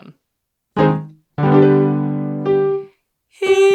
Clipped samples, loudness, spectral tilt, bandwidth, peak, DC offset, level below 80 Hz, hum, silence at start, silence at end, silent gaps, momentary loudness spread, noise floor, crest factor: under 0.1%; -16 LUFS; -7.5 dB/octave; 9 kHz; 0 dBFS; under 0.1%; -52 dBFS; none; 0.75 s; 0 s; none; 13 LU; -75 dBFS; 16 dB